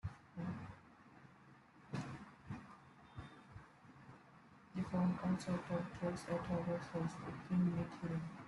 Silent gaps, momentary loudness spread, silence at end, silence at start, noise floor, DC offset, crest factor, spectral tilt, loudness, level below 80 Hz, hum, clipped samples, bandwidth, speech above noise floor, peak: none; 24 LU; 0 s; 0.05 s; -64 dBFS; under 0.1%; 16 dB; -7.5 dB/octave; -43 LUFS; -68 dBFS; none; under 0.1%; 11.5 kHz; 23 dB; -26 dBFS